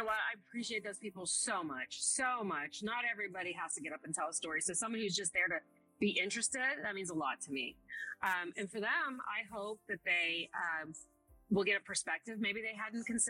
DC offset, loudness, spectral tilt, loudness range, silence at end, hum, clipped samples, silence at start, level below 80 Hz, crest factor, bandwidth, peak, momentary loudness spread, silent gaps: under 0.1%; -37 LUFS; -2 dB/octave; 2 LU; 0 s; none; under 0.1%; 0 s; -74 dBFS; 18 dB; 16 kHz; -22 dBFS; 9 LU; none